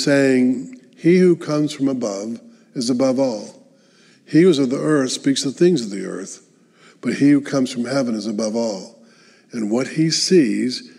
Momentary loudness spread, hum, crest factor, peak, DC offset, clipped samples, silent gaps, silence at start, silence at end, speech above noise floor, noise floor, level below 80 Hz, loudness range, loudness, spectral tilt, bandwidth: 16 LU; none; 16 dB; -4 dBFS; under 0.1%; under 0.1%; none; 0 s; 0.1 s; 35 dB; -53 dBFS; -80 dBFS; 3 LU; -18 LUFS; -5 dB/octave; 12 kHz